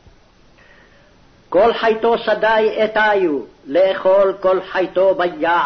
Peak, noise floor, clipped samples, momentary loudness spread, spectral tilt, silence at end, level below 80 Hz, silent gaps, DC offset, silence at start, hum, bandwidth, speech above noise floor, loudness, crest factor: -6 dBFS; -49 dBFS; under 0.1%; 6 LU; -6 dB/octave; 0 s; -52 dBFS; none; under 0.1%; 1.5 s; none; 6.4 kHz; 34 dB; -16 LUFS; 12 dB